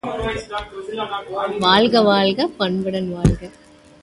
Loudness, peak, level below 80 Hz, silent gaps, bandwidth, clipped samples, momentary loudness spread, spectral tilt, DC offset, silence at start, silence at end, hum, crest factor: -19 LUFS; -2 dBFS; -36 dBFS; none; 11.5 kHz; under 0.1%; 14 LU; -6 dB/octave; under 0.1%; 0.05 s; 0.55 s; none; 18 dB